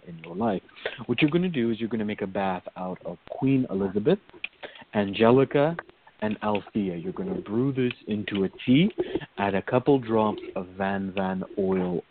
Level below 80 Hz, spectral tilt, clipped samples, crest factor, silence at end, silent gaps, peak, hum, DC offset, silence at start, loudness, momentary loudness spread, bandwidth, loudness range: -58 dBFS; -5.5 dB/octave; under 0.1%; 20 dB; 0.1 s; none; -6 dBFS; none; under 0.1%; 0.05 s; -26 LUFS; 13 LU; 4.5 kHz; 3 LU